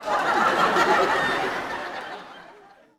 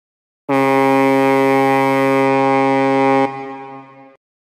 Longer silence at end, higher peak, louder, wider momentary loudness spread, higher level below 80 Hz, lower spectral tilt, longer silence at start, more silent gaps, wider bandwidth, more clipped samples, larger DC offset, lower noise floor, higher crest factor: second, 0.45 s vs 0.7 s; about the same, -6 dBFS vs -4 dBFS; second, -22 LUFS vs -14 LUFS; about the same, 17 LU vs 16 LU; first, -58 dBFS vs -72 dBFS; second, -3.5 dB/octave vs -6.5 dB/octave; second, 0 s vs 0.5 s; neither; first, 17.5 kHz vs 14.5 kHz; neither; neither; first, -50 dBFS vs -37 dBFS; first, 18 dB vs 12 dB